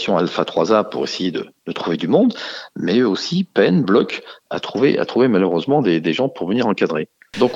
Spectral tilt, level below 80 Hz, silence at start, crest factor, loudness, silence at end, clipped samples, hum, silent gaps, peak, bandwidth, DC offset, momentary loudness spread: -6.5 dB/octave; -62 dBFS; 0 s; 16 dB; -18 LUFS; 0 s; under 0.1%; none; none; -2 dBFS; 8 kHz; under 0.1%; 11 LU